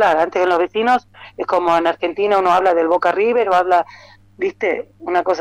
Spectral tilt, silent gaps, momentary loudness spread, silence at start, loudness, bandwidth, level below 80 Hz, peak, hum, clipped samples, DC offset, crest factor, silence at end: -5 dB/octave; none; 8 LU; 0 s; -17 LUFS; 11.5 kHz; -56 dBFS; -6 dBFS; none; under 0.1%; under 0.1%; 12 dB; 0 s